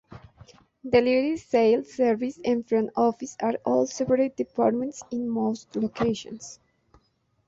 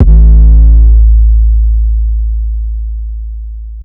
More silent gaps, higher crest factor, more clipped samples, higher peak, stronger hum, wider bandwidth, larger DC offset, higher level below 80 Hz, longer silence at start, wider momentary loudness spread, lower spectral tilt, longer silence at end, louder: neither; first, 20 dB vs 6 dB; second, under 0.1% vs 10%; second, -6 dBFS vs 0 dBFS; neither; first, 8 kHz vs 0.9 kHz; neither; second, -60 dBFS vs -6 dBFS; about the same, 0.1 s vs 0 s; second, 10 LU vs 17 LU; second, -5.5 dB/octave vs -13 dB/octave; first, 0.95 s vs 0 s; second, -25 LUFS vs -9 LUFS